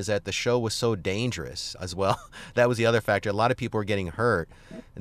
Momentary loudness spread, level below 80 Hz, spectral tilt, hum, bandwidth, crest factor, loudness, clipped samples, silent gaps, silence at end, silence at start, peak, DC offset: 10 LU; -52 dBFS; -5 dB/octave; none; 14 kHz; 18 dB; -26 LUFS; under 0.1%; none; 0 s; 0 s; -8 dBFS; under 0.1%